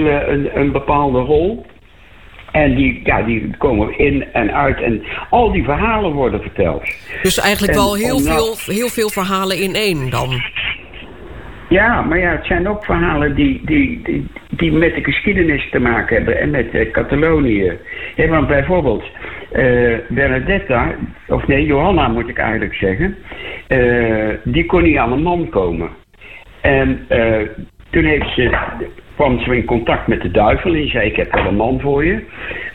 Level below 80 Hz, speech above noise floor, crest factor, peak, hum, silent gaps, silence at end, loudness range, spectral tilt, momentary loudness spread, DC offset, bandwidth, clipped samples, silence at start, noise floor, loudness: -28 dBFS; 28 dB; 12 dB; -4 dBFS; none; none; 0 s; 2 LU; -6 dB/octave; 9 LU; 1%; 18.5 kHz; under 0.1%; 0 s; -43 dBFS; -15 LUFS